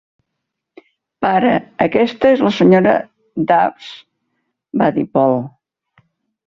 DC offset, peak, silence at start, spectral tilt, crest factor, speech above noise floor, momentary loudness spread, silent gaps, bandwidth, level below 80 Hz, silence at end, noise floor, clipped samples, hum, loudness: under 0.1%; -2 dBFS; 1.2 s; -7.5 dB/octave; 16 dB; 63 dB; 14 LU; none; 7.2 kHz; -54 dBFS; 1 s; -77 dBFS; under 0.1%; none; -15 LUFS